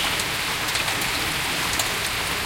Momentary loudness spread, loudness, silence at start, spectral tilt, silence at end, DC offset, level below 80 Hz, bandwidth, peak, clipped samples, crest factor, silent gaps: 1 LU; -22 LUFS; 0 s; -1.5 dB/octave; 0 s; under 0.1%; -44 dBFS; 17 kHz; -6 dBFS; under 0.1%; 20 dB; none